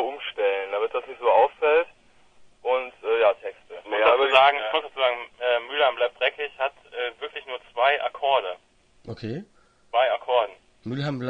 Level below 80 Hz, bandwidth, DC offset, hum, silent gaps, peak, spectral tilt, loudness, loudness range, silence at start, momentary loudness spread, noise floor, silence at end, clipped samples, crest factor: -66 dBFS; 8 kHz; under 0.1%; none; none; -2 dBFS; -5.5 dB/octave; -24 LUFS; 5 LU; 0 s; 15 LU; -58 dBFS; 0 s; under 0.1%; 22 dB